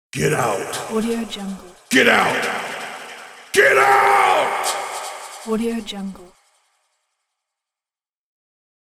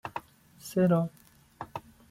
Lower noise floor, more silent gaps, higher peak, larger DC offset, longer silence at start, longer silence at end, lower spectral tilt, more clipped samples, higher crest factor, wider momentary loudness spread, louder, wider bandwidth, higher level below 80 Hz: first, under -90 dBFS vs -52 dBFS; neither; first, -2 dBFS vs -16 dBFS; neither; about the same, 0.15 s vs 0.05 s; first, 2.7 s vs 0.3 s; second, -3.5 dB/octave vs -7.5 dB/octave; neither; about the same, 20 dB vs 16 dB; about the same, 19 LU vs 20 LU; first, -18 LUFS vs -29 LUFS; about the same, 16.5 kHz vs 15.5 kHz; first, -56 dBFS vs -66 dBFS